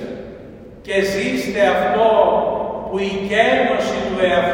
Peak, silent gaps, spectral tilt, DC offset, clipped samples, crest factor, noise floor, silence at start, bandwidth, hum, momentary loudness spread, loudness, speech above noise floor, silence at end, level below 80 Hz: -2 dBFS; none; -5 dB/octave; under 0.1%; under 0.1%; 16 dB; -37 dBFS; 0 s; 16.5 kHz; none; 16 LU; -17 LUFS; 21 dB; 0 s; -46 dBFS